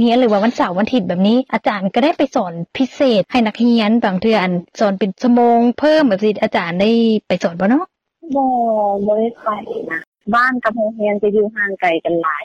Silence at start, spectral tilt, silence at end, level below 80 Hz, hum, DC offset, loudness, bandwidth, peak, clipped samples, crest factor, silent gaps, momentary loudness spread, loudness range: 0 s; -6.5 dB/octave; 0 s; -56 dBFS; none; under 0.1%; -16 LUFS; 7.2 kHz; -4 dBFS; under 0.1%; 12 dB; 10.07-10.12 s; 8 LU; 3 LU